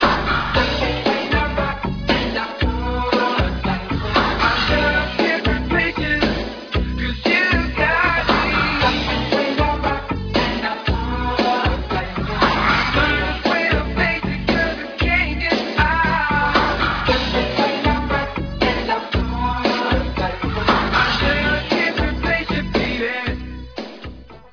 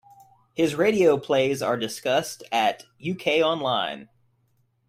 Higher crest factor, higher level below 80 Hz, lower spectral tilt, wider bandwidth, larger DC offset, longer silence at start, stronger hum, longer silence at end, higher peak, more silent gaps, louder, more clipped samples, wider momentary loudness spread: about the same, 18 dB vs 18 dB; first, -28 dBFS vs -66 dBFS; first, -6 dB/octave vs -4.5 dB/octave; second, 5.4 kHz vs 16 kHz; neither; second, 0 s vs 0.55 s; neither; second, 0.05 s vs 0.85 s; first, -2 dBFS vs -8 dBFS; neither; first, -19 LUFS vs -24 LUFS; neither; second, 7 LU vs 12 LU